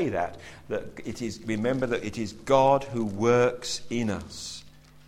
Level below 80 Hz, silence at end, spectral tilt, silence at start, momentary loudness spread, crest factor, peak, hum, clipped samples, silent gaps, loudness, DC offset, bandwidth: -52 dBFS; 0.1 s; -5 dB/octave; 0 s; 15 LU; 20 dB; -8 dBFS; none; under 0.1%; none; -27 LUFS; under 0.1%; 15.5 kHz